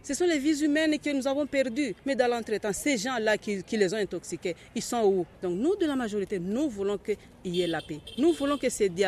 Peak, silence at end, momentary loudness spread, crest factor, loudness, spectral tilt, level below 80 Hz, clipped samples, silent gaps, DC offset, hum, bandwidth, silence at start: -10 dBFS; 0 s; 8 LU; 18 dB; -28 LUFS; -4.5 dB/octave; -58 dBFS; under 0.1%; none; under 0.1%; none; 13.5 kHz; 0.05 s